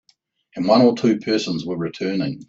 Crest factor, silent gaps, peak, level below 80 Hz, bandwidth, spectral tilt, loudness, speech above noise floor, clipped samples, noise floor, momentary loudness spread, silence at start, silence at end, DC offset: 18 dB; none; -2 dBFS; -62 dBFS; 7.8 kHz; -6 dB/octave; -19 LUFS; 43 dB; under 0.1%; -62 dBFS; 11 LU; 0.55 s; 0.05 s; under 0.1%